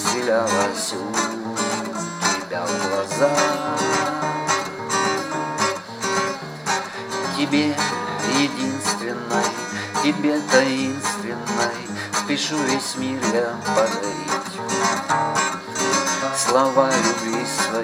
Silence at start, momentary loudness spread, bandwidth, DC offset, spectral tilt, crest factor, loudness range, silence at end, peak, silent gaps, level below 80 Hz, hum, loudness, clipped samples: 0 s; 7 LU; 16.5 kHz; under 0.1%; -3 dB/octave; 22 dB; 2 LU; 0 s; 0 dBFS; none; -66 dBFS; none; -21 LUFS; under 0.1%